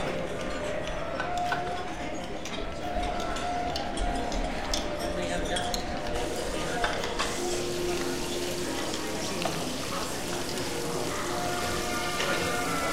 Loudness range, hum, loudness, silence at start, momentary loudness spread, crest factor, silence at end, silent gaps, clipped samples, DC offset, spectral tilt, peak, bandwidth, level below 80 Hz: 2 LU; none; -31 LUFS; 0 s; 5 LU; 20 dB; 0 s; none; under 0.1%; 1%; -3.5 dB/octave; -12 dBFS; 16 kHz; -40 dBFS